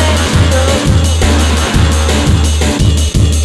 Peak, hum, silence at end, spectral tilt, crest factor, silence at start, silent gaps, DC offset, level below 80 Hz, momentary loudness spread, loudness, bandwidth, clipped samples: 0 dBFS; none; 0 s; -5 dB/octave; 8 dB; 0 s; none; under 0.1%; -14 dBFS; 1 LU; -11 LUFS; 13 kHz; under 0.1%